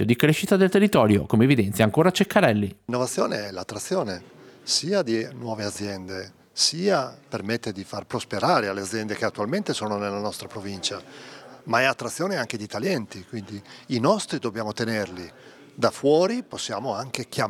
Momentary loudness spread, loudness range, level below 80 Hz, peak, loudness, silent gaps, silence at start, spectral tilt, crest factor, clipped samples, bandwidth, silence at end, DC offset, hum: 16 LU; 7 LU; -64 dBFS; -4 dBFS; -24 LUFS; none; 0 s; -5 dB/octave; 22 dB; under 0.1%; 19 kHz; 0 s; under 0.1%; none